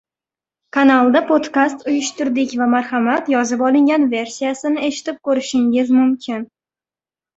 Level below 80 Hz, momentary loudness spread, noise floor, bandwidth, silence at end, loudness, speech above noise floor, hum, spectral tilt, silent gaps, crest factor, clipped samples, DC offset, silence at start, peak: -62 dBFS; 9 LU; under -90 dBFS; 8 kHz; 0.9 s; -17 LUFS; over 74 dB; none; -3.5 dB/octave; none; 16 dB; under 0.1%; under 0.1%; 0.75 s; -2 dBFS